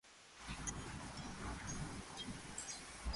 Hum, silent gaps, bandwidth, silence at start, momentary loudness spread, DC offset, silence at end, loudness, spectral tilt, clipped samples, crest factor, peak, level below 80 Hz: none; none; 11.5 kHz; 0.05 s; 4 LU; under 0.1%; 0 s; -48 LUFS; -3 dB/octave; under 0.1%; 18 dB; -30 dBFS; -54 dBFS